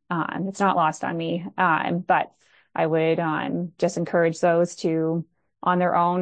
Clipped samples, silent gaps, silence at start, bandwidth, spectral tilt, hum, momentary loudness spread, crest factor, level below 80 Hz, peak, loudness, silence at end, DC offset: under 0.1%; none; 0.1 s; 9.2 kHz; -6 dB/octave; none; 7 LU; 16 dB; -70 dBFS; -6 dBFS; -23 LUFS; 0 s; under 0.1%